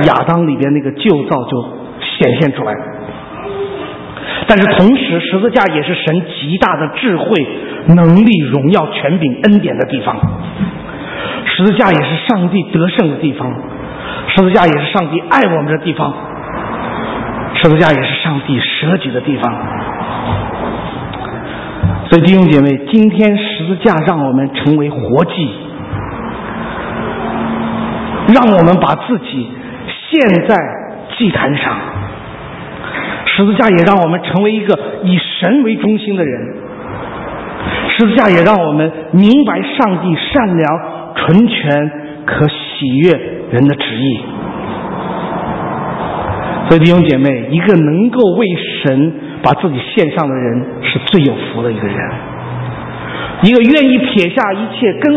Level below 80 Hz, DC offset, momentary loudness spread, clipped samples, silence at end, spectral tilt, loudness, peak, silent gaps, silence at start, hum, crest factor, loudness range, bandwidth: -38 dBFS; under 0.1%; 14 LU; 0.3%; 0 s; -8.5 dB/octave; -12 LUFS; 0 dBFS; none; 0 s; none; 12 dB; 5 LU; 6.4 kHz